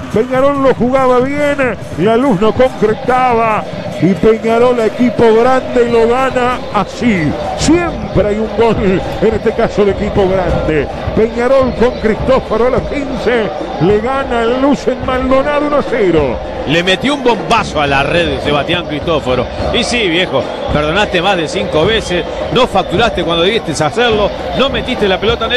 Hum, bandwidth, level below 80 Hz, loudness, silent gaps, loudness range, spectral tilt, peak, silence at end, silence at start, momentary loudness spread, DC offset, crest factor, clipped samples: none; 12.5 kHz; -30 dBFS; -12 LUFS; none; 2 LU; -5.5 dB/octave; 0 dBFS; 0 s; 0 s; 5 LU; under 0.1%; 12 dB; under 0.1%